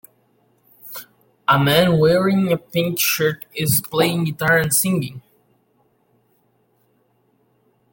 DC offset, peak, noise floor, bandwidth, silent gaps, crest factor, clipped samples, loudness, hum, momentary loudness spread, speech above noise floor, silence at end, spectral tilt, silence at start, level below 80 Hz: under 0.1%; -2 dBFS; -63 dBFS; 17 kHz; none; 20 dB; under 0.1%; -18 LUFS; none; 15 LU; 45 dB; 2.75 s; -4.5 dB/octave; 0.85 s; -54 dBFS